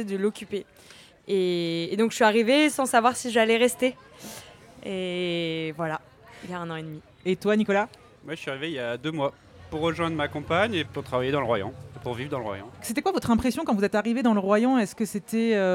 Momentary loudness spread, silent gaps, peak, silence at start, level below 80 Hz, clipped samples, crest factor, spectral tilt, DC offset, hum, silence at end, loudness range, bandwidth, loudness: 15 LU; none; -6 dBFS; 0 s; -58 dBFS; under 0.1%; 20 dB; -5 dB/octave; under 0.1%; none; 0 s; 6 LU; 16.5 kHz; -26 LUFS